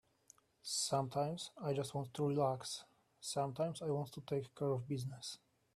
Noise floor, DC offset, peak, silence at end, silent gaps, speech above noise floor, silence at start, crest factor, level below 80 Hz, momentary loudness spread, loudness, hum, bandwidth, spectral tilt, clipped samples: -69 dBFS; under 0.1%; -22 dBFS; 0.4 s; none; 29 dB; 0.65 s; 18 dB; -76 dBFS; 12 LU; -40 LUFS; none; 14.5 kHz; -5 dB/octave; under 0.1%